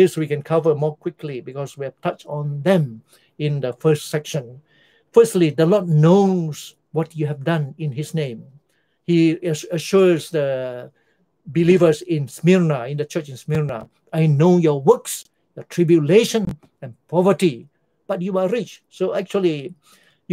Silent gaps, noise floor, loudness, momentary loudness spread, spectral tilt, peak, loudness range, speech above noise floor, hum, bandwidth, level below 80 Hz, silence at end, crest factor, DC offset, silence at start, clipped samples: none; -66 dBFS; -19 LUFS; 15 LU; -7 dB/octave; 0 dBFS; 5 LU; 47 dB; none; 16 kHz; -60 dBFS; 0 s; 18 dB; under 0.1%; 0 s; under 0.1%